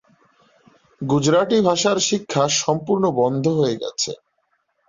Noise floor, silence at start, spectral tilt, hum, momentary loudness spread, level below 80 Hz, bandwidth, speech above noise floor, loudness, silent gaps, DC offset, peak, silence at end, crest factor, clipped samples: -69 dBFS; 1 s; -4.5 dB/octave; none; 8 LU; -58 dBFS; 7.8 kHz; 50 dB; -19 LUFS; none; under 0.1%; -4 dBFS; 0.75 s; 16 dB; under 0.1%